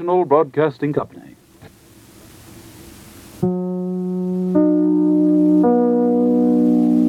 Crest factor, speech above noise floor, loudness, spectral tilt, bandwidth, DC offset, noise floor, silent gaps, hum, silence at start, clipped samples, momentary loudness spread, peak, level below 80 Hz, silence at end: 16 dB; 28 dB; -17 LUFS; -9 dB/octave; 12.5 kHz; under 0.1%; -46 dBFS; none; none; 0 s; under 0.1%; 9 LU; -2 dBFS; -56 dBFS; 0 s